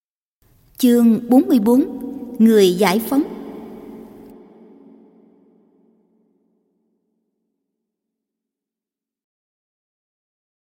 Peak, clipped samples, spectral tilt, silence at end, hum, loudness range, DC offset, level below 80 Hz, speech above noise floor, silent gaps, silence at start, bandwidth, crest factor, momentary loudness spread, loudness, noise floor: -2 dBFS; under 0.1%; -5.5 dB/octave; 6.65 s; none; 13 LU; under 0.1%; -62 dBFS; 75 dB; none; 0.8 s; 17 kHz; 18 dB; 23 LU; -15 LUFS; -88 dBFS